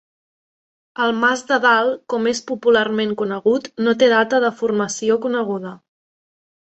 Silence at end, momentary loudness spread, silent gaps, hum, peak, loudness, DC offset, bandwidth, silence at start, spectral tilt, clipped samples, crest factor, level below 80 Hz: 0.9 s; 7 LU; none; none; -2 dBFS; -18 LUFS; under 0.1%; 8.2 kHz; 1 s; -4 dB/octave; under 0.1%; 18 dB; -64 dBFS